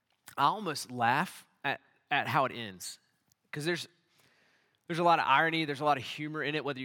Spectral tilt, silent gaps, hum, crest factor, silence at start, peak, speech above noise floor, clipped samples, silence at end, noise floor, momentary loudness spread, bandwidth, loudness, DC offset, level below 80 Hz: -4.5 dB/octave; none; none; 20 dB; 0.3 s; -12 dBFS; 40 dB; under 0.1%; 0 s; -70 dBFS; 16 LU; 18 kHz; -31 LUFS; under 0.1%; -86 dBFS